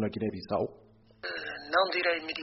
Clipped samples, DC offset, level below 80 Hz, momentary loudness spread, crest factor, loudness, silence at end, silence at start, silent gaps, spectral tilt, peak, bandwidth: under 0.1%; under 0.1%; -66 dBFS; 11 LU; 18 dB; -31 LUFS; 0 s; 0 s; none; -2.5 dB/octave; -14 dBFS; 6 kHz